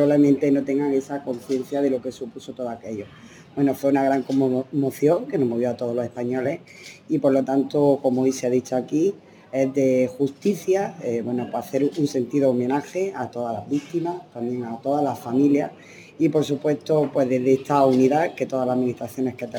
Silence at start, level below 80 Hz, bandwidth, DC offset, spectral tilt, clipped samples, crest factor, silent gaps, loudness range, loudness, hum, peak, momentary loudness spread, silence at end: 0 s; -70 dBFS; 18.5 kHz; under 0.1%; -7 dB/octave; under 0.1%; 16 dB; none; 4 LU; -23 LUFS; none; -6 dBFS; 11 LU; 0 s